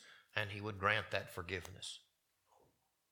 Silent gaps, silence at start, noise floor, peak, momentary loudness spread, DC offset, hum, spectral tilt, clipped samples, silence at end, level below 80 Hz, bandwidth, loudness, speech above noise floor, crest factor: none; 0 s; -77 dBFS; -16 dBFS; 13 LU; under 0.1%; none; -4 dB/octave; under 0.1%; 1.1 s; -72 dBFS; 19 kHz; -40 LUFS; 36 dB; 26 dB